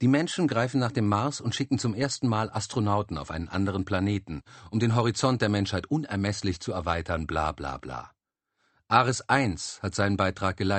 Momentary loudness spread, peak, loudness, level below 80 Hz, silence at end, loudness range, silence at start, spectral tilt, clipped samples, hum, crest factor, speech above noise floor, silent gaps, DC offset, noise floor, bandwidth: 9 LU; -6 dBFS; -27 LUFS; -50 dBFS; 0 s; 2 LU; 0 s; -5.5 dB/octave; under 0.1%; none; 22 dB; 53 dB; none; under 0.1%; -79 dBFS; 8.8 kHz